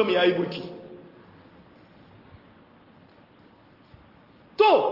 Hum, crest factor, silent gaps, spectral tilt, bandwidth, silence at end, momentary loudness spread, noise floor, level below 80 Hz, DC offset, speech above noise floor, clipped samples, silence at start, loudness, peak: none; 20 dB; none; -7 dB/octave; 5.8 kHz; 0 s; 26 LU; -55 dBFS; -68 dBFS; under 0.1%; 33 dB; under 0.1%; 0 s; -23 LUFS; -6 dBFS